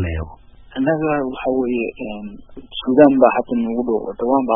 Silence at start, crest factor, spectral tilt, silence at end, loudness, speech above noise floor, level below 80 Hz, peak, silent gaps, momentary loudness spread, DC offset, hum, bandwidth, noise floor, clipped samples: 0 s; 18 dB; -10.5 dB/octave; 0 s; -18 LUFS; 23 dB; -40 dBFS; 0 dBFS; none; 19 LU; under 0.1%; none; 3.7 kHz; -40 dBFS; under 0.1%